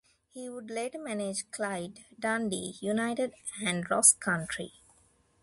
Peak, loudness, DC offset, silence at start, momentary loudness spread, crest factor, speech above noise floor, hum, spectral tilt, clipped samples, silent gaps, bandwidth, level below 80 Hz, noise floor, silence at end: -6 dBFS; -29 LUFS; under 0.1%; 0.35 s; 19 LU; 26 dB; 35 dB; none; -2.5 dB/octave; under 0.1%; none; 12 kHz; -68 dBFS; -66 dBFS; 0.75 s